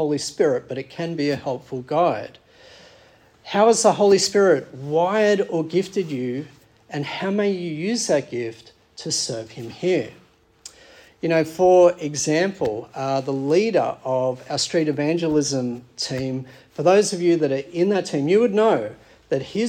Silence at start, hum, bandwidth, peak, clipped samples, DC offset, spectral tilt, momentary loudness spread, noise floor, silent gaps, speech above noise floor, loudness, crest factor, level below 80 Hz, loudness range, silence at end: 0 s; none; 15.5 kHz; -4 dBFS; under 0.1%; under 0.1%; -4.5 dB/octave; 13 LU; -53 dBFS; none; 32 dB; -21 LUFS; 18 dB; -62 dBFS; 6 LU; 0 s